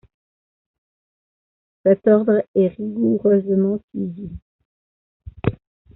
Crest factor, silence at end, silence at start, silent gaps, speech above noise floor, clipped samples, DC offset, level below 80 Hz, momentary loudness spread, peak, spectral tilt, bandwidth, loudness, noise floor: 20 dB; 0.4 s; 1.85 s; 2.48-2.54 s, 3.84-3.88 s, 4.42-4.59 s, 4.65-5.20 s; over 72 dB; under 0.1%; under 0.1%; -50 dBFS; 13 LU; -2 dBFS; -9.5 dB/octave; 4 kHz; -19 LUFS; under -90 dBFS